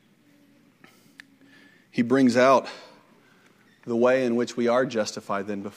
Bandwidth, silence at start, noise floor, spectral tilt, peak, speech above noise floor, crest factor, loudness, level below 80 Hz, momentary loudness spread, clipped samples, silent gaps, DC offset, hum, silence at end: 11.5 kHz; 1.95 s; -59 dBFS; -5.5 dB/octave; -6 dBFS; 37 dB; 20 dB; -23 LUFS; -76 dBFS; 14 LU; under 0.1%; none; under 0.1%; none; 0.05 s